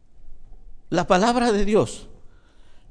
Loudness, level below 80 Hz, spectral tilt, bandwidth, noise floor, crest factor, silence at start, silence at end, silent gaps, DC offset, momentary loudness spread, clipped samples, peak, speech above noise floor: -21 LUFS; -36 dBFS; -5 dB/octave; 10.5 kHz; -45 dBFS; 20 dB; 0.15 s; 0.15 s; none; under 0.1%; 10 LU; under 0.1%; -4 dBFS; 26 dB